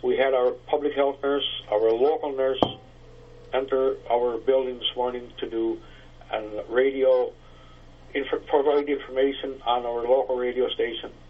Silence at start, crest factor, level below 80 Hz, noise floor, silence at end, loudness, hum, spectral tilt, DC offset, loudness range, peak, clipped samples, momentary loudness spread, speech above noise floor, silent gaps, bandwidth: 0.05 s; 24 dB; -50 dBFS; -47 dBFS; 0 s; -25 LUFS; 60 Hz at -55 dBFS; -6.5 dB/octave; under 0.1%; 2 LU; -2 dBFS; under 0.1%; 10 LU; 23 dB; none; 5.8 kHz